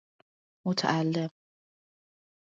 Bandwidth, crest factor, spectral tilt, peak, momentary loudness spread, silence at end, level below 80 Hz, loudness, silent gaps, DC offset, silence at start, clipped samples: 7.6 kHz; 24 dB; -5.5 dB/octave; -10 dBFS; 10 LU; 1.25 s; -76 dBFS; -30 LUFS; none; under 0.1%; 0.65 s; under 0.1%